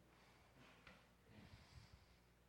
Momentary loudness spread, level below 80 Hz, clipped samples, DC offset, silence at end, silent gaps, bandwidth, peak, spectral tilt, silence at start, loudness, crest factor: 4 LU; -74 dBFS; under 0.1%; under 0.1%; 0 s; none; 17 kHz; -50 dBFS; -4.5 dB/octave; 0 s; -66 LUFS; 18 dB